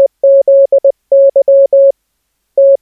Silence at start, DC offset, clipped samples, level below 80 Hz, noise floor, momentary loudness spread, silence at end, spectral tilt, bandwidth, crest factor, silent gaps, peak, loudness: 0 s; under 0.1%; under 0.1%; -72 dBFS; -66 dBFS; 5 LU; 0.05 s; -7.5 dB/octave; 0.8 kHz; 6 dB; none; -2 dBFS; -8 LUFS